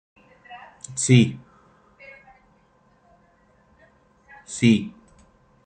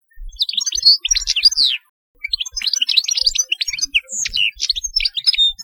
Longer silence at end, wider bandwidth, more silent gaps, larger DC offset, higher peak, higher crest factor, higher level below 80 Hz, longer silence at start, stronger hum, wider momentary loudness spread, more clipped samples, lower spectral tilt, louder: first, 0.75 s vs 0 s; second, 9.4 kHz vs 19.5 kHz; second, none vs 1.89-2.15 s; neither; about the same, -2 dBFS vs 0 dBFS; first, 24 dB vs 18 dB; second, -62 dBFS vs -40 dBFS; first, 0.5 s vs 0.15 s; neither; first, 28 LU vs 10 LU; neither; first, -5.5 dB/octave vs 4 dB/octave; second, -20 LUFS vs -15 LUFS